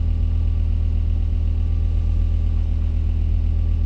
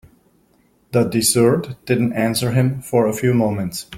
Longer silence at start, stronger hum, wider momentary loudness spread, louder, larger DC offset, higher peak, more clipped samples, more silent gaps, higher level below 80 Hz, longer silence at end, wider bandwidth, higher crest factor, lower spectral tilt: second, 0 s vs 0.95 s; neither; second, 1 LU vs 7 LU; second, -22 LUFS vs -18 LUFS; neither; second, -12 dBFS vs -2 dBFS; neither; neither; first, -20 dBFS vs -52 dBFS; about the same, 0 s vs 0 s; second, 4 kHz vs 16.5 kHz; second, 8 dB vs 16 dB; first, -9.5 dB/octave vs -5 dB/octave